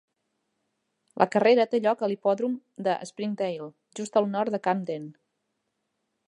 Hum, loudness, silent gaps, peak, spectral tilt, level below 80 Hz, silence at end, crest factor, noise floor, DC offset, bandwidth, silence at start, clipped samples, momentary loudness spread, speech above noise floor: none; -26 LUFS; none; -4 dBFS; -5.5 dB/octave; -78 dBFS; 1.15 s; 24 dB; -79 dBFS; under 0.1%; 11 kHz; 1.15 s; under 0.1%; 16 LU; 53 dB